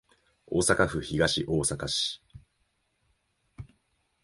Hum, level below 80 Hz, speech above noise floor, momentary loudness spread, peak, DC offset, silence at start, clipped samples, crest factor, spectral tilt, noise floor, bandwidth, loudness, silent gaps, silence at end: none; -50 dBFS; 47 dB; 23 LU; -8 dBFS; under 0.1%; 0.5 s; under 0.1%; 24 dB; -3.5 dB/octave; -74 dBFS; 12 kHz; -27 LUFS; none; 0.6 s